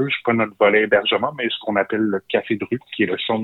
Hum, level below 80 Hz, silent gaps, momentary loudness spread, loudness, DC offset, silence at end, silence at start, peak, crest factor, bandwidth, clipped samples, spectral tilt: none; -64 dBFS; none; 8 LU; -20 LUFS; under 0.1%; 0 s; 0 s; -4 dBFS; 16 dB; 4.1 kHz; under 0.1%; -7.5 dB/octave